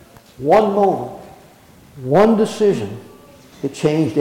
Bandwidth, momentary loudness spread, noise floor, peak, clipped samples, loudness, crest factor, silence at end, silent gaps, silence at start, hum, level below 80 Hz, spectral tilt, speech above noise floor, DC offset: 16.5 kHz; 18 LU; -46 dBFS; -4 dBFS; under 0.1%; -17 LUFS; 14 dB; 0 s; none; 0.4 s; none; -52 dBFS; -7 dB/octave; 30 dB; under 0.1%